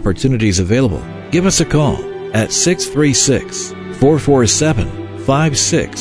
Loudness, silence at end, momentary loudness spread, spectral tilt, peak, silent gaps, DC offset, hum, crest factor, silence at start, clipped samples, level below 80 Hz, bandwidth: -14 LUFS; 0 s; 11 LU; -4.5 dB/octave; 0 dBFS; none; under 0.1%; none; 14 dB; 0 s; under 0.1%; -32 dBFS; 11 kHz